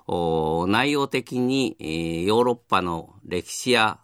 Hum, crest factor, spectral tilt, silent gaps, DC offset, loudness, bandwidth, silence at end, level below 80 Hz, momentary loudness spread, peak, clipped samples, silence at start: none; 20 dB; -4.5 dB/octave; none; under 0.1%; -23 LUFS; 16 kHz; 0.05 s; -52 dBFS; 9 LU; -4 dBFS; under 0.1%; 0.1 s